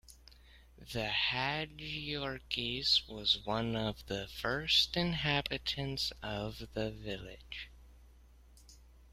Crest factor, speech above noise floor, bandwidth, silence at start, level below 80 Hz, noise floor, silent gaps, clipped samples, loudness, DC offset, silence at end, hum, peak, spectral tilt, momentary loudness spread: 22 dB; 24 dB; 16 kHz; 0.1 s; -54 dBFS; -59 dBFS; none; under 0.1%; -34 LUFS; under 0.1%; 0 s; none; -16 dBFS; -4 dB/octave; 14 LU